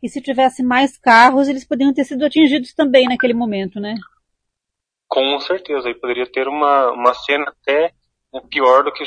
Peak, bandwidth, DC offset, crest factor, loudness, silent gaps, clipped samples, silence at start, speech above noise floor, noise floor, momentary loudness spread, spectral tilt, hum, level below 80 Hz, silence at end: 0 dBFS; 10.5 kHz; under 0.1%; 16 dB; -15 LUFS; none; under 0.1%; 0 s; 66 dB; -82 dBFS; 11 LU; -4.5 dB/octave; none; -58 dBFS; 0 s